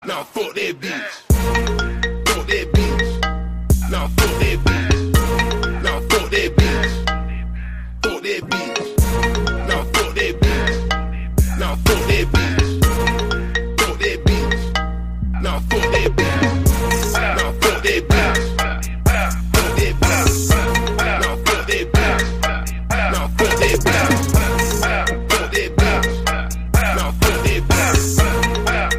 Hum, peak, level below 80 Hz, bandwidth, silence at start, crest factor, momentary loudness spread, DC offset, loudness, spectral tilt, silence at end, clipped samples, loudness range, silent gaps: none; -2 dBFS; -22 dBFS; 16 kHz; 0 s; 16 dB; 7 LU; 1%; -18 LUFS; -4.5 dB/octave; 0 s; under 0.1%; 3 LU; none